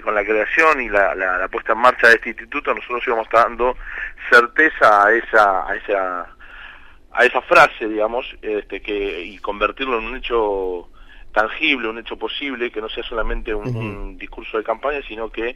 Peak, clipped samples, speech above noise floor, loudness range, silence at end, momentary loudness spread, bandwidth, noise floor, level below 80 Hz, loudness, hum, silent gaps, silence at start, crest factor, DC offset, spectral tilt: -2 dBFS; under 0.1%; 23 dB; 8 LU; 0 s; 15 LU; 15.5 kHz; -41 dBFS; -38 dBFS; -18 LUFS; none; none; 0 s; 18 dB; under 0.1%; -4.5 dB/octave